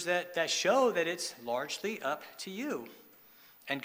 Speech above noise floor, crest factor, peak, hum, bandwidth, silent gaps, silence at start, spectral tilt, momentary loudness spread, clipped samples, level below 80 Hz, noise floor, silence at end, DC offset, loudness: 26 dB; 18 dB; -16 dBFS; none; 16 kHz; none; 0 s; -2.5 dB/octave; 14 LU; under 0.1%; -84 dBFS; -59 dBFS; 0 s; under 0.1%; -33 LUFS